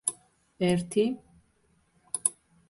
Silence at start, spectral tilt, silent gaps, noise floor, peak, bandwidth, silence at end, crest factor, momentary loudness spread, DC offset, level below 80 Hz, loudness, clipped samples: 0.05 s; -4.5 dB/octave; none; -68 dBFS; -6 dBFS; 12 kHz; 0.4 s; 24 dB; 9 LU; under 0.1%; -64 dBFS; -29 LUFS; under 0.1%